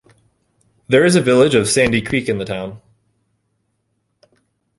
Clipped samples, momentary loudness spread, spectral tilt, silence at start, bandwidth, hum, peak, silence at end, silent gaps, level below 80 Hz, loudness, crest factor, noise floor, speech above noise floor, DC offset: under 0.1%; 13 LU; -4.5 dB/octave; 0.9 s; 11.5 kHz; none; -2 dBFS; 2 s; none; -48 dBFS; -15 LUFS; 18 dB; -69 dBFS; 54 dB; under 0.1%